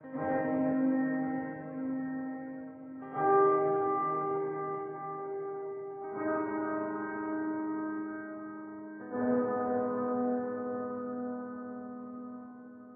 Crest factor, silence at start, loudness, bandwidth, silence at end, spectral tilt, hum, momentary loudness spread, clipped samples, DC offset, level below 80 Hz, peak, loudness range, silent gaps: 18 dB; 0 s; -34 LUFS; 3 kHz; 0 s; -8.5 dB/octave; none; 14 LU; under 0.1%; under 0.1%; -76 dBFS; -16 dBFS; 5 LU; none